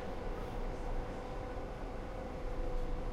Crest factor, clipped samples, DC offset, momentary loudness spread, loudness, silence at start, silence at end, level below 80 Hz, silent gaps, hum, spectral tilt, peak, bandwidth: 12 dB; under 0.1%; under 0.1%; 2 LU; -43 LUFS; 0 s; 0 s; -40 dBFS; none; none; -7 dB/octave; -26 dBFS; 10 kHz